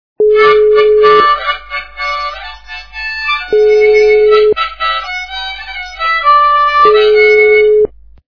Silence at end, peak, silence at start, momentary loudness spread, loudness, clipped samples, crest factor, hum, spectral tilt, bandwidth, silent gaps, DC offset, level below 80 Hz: 0.4 s; 0 dBFS; 0.2 s; 14 LU; -9 LUFS; 0.3%; 10 dB; none; -3.5 dB/octave; 5.4 kHz; none; 1%; -40 dBFS